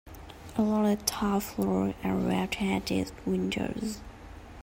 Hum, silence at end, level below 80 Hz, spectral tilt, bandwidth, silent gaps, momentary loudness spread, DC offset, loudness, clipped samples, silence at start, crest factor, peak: none; 0 s; -50 dBFS; -5 dB/octave; 16.5 kHz; none; 19 LU; under 0.1%; -30 LUFS; under 0.1%; 0.05 s; 22 dB; -8 dBFS